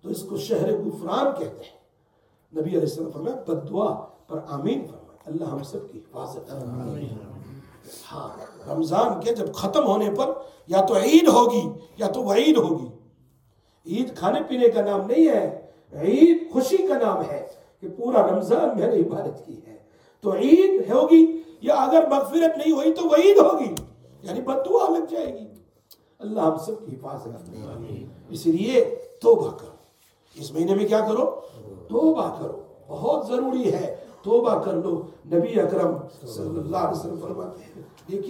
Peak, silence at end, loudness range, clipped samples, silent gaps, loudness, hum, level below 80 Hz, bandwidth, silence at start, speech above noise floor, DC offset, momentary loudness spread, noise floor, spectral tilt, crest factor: -2 dBFS; 0 s; 11 LU; under 0.1%; none; -22 LUFS; none; -64 dBFS; 17 kHz; 0.05 s; 42 dB; under 0.1%; 21 LU; -64 dBFS; -6 dB/octave; 20 dB